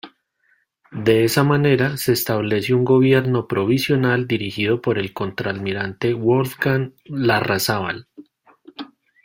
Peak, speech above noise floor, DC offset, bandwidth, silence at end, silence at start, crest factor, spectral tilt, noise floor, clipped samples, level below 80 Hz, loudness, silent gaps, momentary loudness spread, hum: -2 dBFS; 45 dB; under 0.1%; 16.5 kHz; 0.4 s; 0.05 s; 18 dB; -6 dB/octave; -64 dBFS; under 0.1%; -54 dBFS; -19 LUFS; none; 11 LU; none